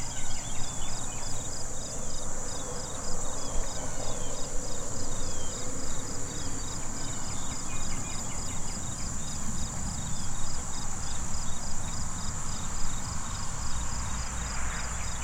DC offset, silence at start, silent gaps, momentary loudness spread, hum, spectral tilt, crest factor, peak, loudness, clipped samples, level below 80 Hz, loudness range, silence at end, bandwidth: under 0.1%; 0 s; none; 1 LU; none; -3 dB/octave; 14 dB; -14 dBFS; -35 LUFS; under 0.1%; -36 dBFS; 1 LU; 0 s; 11.5 kHz